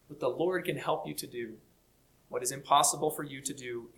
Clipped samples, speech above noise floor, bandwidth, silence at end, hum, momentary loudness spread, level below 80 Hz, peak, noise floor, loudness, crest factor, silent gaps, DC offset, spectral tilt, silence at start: under 0.1%; 34 dB; 19 kHz; 0.1 s; none; 15 LU; -70 dBFS; -12 dBFS; -67 dBFS; -32 LUFS; 22 dB; none; under 0.1%; -3 dB/octave; 0.1 s